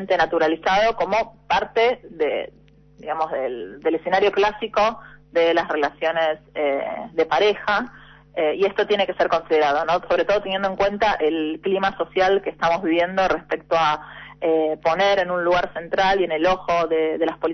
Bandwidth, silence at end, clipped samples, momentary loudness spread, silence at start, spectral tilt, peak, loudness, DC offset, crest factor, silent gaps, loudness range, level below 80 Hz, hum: 6.4 kHz; 0 s; under 0.1%; 7 LU; 0 s; -5 dB/octave; -6 dBFS; -21 LUFS; under 0.1%; 14 dB; none; 2 LU; -50 dBFS; none